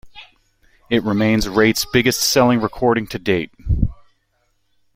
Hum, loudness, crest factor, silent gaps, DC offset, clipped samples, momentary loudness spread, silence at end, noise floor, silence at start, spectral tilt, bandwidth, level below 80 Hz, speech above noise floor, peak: none; -17 LUFS; 18 dB; none; under 0.1%; under 0.1%; 7 LU; 1.05 s; -65 dBFS; 0.05 s; -4.5 dB/octave; 16.5 kHz; -32 dBFS; 48 dB; -2 dBFS